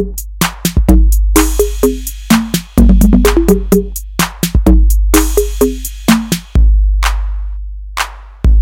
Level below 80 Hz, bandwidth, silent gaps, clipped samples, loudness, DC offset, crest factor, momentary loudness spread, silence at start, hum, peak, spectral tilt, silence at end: -12 dBFS; 17 kHz; none; 0.5%; -12 LUFS; under 0.1%; 10 dB; 11 LU; 0 s; none; 0 dBFS; -5.5 dB/octave; 0 s